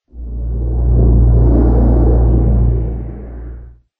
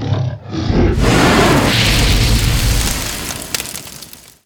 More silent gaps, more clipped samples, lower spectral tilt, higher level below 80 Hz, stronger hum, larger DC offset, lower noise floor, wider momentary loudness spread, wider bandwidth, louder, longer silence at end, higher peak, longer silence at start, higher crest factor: neither; neither; first, -14 dB/octave vs -4.5 dB/octave; first, -14 dBFS vs -20 dBFS; neither; neither; about the same, -33 dBFS vs -36 dBFS; first, 18 LU vs 14 LU; second, 1.8 kHz vs over 20 kHz; about the same, -13 LUFS vs -14 LUFS; about the same, 0.3 s vs 0.35 s; about the same, 0 dBFS vs 0 dBFS; first, 0.15 s vs 0 s; about the same, 12 dB vs 14 dB